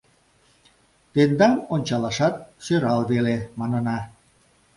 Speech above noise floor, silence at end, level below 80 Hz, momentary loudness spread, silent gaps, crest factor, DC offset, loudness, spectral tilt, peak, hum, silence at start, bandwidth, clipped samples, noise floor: 39 dB; 0.7 s; -56 dBFS; 9 LU; none; 18 dB; under 0.1%; -22 LUFS; -6.5 dB/octave; -4 dBFS; none; 1.15 s; 11.5 kHz; under 0.1%; -60 dBFS